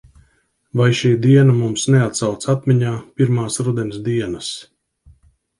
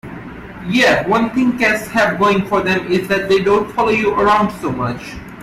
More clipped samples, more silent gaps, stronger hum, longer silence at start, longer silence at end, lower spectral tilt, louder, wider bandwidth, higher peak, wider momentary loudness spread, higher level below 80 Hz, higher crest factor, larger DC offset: neither; neither; neither; first, 0.75 s vs 0.05 s; first, 1 s vs 0 s; about the same, -6 dB/octave vs -5.5 dB/octave; about the same, -17 LUFS vs -15 LUFS; second, 11.5 kHz vs 15.5 kHz; about the same, -2 dBFS vs -2 dBFS; second, 12 LU vs 15 LU; second, -52 dBFS vs -42 dBFS; about the same, 16 dB vs 12 dB; neither